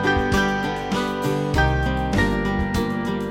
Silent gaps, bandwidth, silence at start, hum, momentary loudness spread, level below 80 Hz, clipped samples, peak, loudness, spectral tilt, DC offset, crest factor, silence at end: none; 16.5 kHz; 0 s; none; 4 LU; -30 dBFS; under 0.1%; -6 dBFS; -22 LUFS; -6 dB/octave; under 0.1%; 14 dB; 0 s